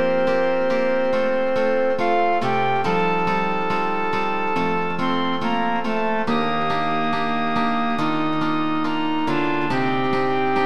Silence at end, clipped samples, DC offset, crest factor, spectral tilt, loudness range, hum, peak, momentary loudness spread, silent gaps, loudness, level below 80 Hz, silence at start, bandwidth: 0 s; under 0.1%; 4%; 12 dB; -6.5 dB/octave; 2 LU; none; -8 dBFS; 3 LU; none; -21 LUFS; -56 dBFS; 0 s; 10.5 kHz